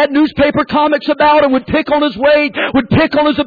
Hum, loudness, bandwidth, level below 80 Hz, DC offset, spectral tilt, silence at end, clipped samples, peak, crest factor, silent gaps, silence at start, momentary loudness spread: none; -12 LUFS; 4.9 kHz; -38 dBFS; under 0.1%; -8 dB/octave; 0 s; under 0.1%; -2 dBFS; 10 dB; none; 0 s; 4 LU